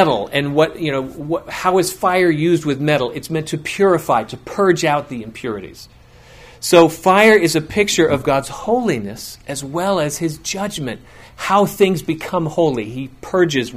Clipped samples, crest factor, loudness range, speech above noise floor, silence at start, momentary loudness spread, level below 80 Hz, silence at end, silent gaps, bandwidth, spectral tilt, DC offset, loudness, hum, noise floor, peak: under 0.1%; 18 dB; 5 LU; 26 dB; 0 s; 15 LU; -48 dBFS; 0 s; none; 16 kHz; -5 dB/octave; under 0.1%; -17 LUFS; none; -43 dBFS; 0 dBFS